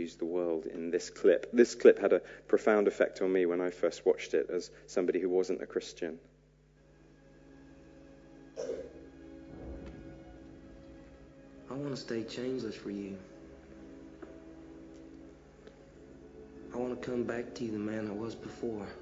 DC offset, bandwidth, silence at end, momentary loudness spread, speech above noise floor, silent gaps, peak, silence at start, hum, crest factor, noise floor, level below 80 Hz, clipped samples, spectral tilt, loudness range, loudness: under 0.1%; 7.8 kHz; 0 s; 24 LU; 32 dB; none; -8 dBFS; 0 s; none; 26 dB; -63 dBFS; -62 dBFS; under 0.1%; -5.5 dB/octave; 20 LU; -32 LUFS